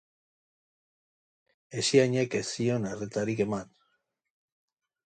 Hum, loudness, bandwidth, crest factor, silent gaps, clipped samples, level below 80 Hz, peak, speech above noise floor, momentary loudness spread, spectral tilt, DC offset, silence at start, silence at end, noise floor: none; -28 LUFS; 9.4 kHz; 24 dB; none; under 0.1%; -68 dBFS; -8 dBFS; 49 dB; 10 LU; -5 dB/octave; under 0.1%; 1.7 s; 1.4 s; -76 dBFS